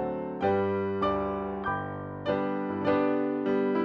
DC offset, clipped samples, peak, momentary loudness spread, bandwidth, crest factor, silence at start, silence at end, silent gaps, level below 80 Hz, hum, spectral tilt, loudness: under 0.1%; under 0.1%; -14 dBFS; 6 LU; 6 kHz; 14 dB; 0 s; 0 s; none; -56 dBFS; none; -9 dB/octave; -29 LUFS